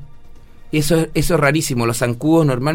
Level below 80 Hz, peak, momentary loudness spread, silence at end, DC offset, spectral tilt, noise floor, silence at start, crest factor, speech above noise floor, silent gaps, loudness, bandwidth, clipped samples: -34 dBFS; -2 dBFS; 4 LU; 0 s; under 0.1%; -5.5 dB/octave; -37 dBFS; 0 s; 16 dB; 21 dB; none; -17 LUFS; 16.5 kHz; under 0.1%